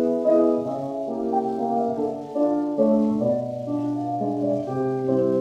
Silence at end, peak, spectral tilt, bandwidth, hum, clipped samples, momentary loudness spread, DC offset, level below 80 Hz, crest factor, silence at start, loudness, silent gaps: 0 s; -8 dBFS; -9.5 dB/octave; 8.8 kHz; none; under 0.1%; 8 LU; under 0.1%; -62 dBFS; 14 dB; 0 s; -24 LUFS; none